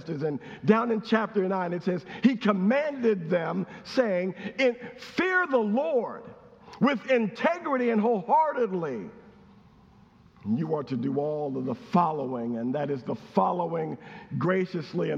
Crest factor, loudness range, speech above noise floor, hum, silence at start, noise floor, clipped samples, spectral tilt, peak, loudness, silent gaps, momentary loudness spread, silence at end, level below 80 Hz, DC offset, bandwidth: 20 dB; 4 LU; 29 dB; none; 0 s; -56 dBFS; under 0.1%; -7.5 dB/octave; -6 dBFS; -27 LUFS; none; 9 LU; 0 s; -70 dBFS; under 0.1%; 7.6 kHz